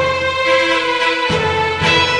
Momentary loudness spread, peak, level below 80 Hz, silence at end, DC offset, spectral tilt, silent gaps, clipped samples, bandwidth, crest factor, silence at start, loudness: 3 LU; -2 dBFS; -44 dBFS; 0 s; under 0.1%; -3.5 dB/octave; none; under 0.1%; 11 kHz; 14 dB; 0 s; -14 LUFS